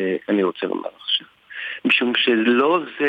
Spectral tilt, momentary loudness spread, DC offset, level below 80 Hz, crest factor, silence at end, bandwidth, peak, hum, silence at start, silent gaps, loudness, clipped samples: -6 dB/octave; 12 LU; under 0.1%; -76 dBFS; 16 dB; 0 s; 8.2 kHz; -4 dBFS; none; 0 s; none; -20 LUFS; under 0.1%